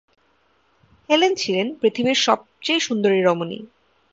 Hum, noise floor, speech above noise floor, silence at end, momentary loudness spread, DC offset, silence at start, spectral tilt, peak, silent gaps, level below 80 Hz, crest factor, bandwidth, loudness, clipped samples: none; -63 dBFS; 43 dB; 0.45 s; 6 LU; under 0.1%; 1.1 s; -3.5 dB/octave; -2 dBFS; none; -66 dBFS; 18 dB; 7.8 kHz; -20 LUFS; under 0.1%